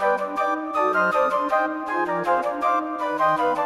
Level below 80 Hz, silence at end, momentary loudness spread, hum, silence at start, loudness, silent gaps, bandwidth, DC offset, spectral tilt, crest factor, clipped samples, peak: -60 dBFS; 0 s; 4 LU; none; 0 s; -22 LUFS; none; 14 kHz; under 0.1%; -5.5 dB/octave; 14 dB; under 0.1%; -8 dBFS